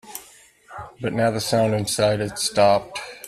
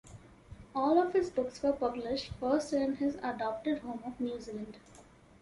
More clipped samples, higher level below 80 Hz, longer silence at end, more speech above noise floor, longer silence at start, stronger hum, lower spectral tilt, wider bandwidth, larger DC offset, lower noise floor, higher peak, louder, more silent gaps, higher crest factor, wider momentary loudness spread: neither; first, -54 dBFS vs -60 dBFS; second, 0 s vs 0.4 s; first, 30 dB vs 25 dB; about the same, 0.05 s vs 0.05 s; neither; about the same, -4.5 dB/octave vs -5.5 dB/octave; first, 15.5 kHz vs 11.5 kHz; neither; second, -50 dBFS vs -58 dBFS; first, -6 dBFS vs -14 dBFS; first, -21 LUFS vs -33 LUFS; neither; about the same, 18 dB vs 18 dB; first, 20 LU vs 13 LU